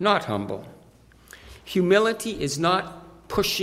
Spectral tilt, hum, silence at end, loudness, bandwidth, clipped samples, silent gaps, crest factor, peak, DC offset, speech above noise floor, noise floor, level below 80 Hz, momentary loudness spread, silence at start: -4.5 dB/octave; none; 0 s; -24 LUFS; 16 kHz; under 0.1%; none; 20 dB; -6 dBFS; under 0.1%; 30 dB; -53 dBFS; -52 dBFS; 21 LU; 0 s